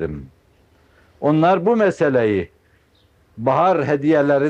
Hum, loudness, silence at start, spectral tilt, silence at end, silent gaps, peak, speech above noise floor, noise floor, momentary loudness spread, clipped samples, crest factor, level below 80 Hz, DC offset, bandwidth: none; -18 LUFS; 0 s; -8 dB/octave; 0 s; none; -4 dBFS; 40 dB; -57 dBFS; 10 LU; under 0.1%; 14 dB; -52 dBFS; under 0.1%; 8.8 kHz